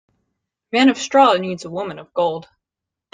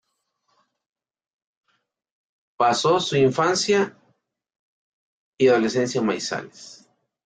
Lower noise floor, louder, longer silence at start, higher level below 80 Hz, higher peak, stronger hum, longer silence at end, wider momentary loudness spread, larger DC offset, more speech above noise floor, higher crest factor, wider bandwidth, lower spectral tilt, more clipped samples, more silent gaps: first, -85 dBFS vs -74 dBFS; first, -18 LUFS vs -21 LUFS; second, 0.75 s vs 2.6 s; about the same, -64 dBFS vs -66 dBFS; first, -2 dBFS vs -6 dBFS; neither; first, 0.7 s vs 0.55 s; first, 14 LU vs 11 LU; neither; first, 68 dB vs 53 dB; about the same, 18 dB vs 18 dB; about the same, 9.4 kHz vs 9.4 kHz; about the same, -4.5 dB/octave vs -4.5 dB/octave; neither; second, none vs 4.56-5.33 s